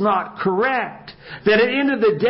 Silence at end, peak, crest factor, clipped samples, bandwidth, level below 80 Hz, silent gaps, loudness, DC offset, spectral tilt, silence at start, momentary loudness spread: 0 s; -4 dBFS; 16 dB; under 0.1%; 5.8 kHz; -56 dBFS; none; -19 LUFS; under 0.1%; -10 dB/octave; 0 s; 15 LU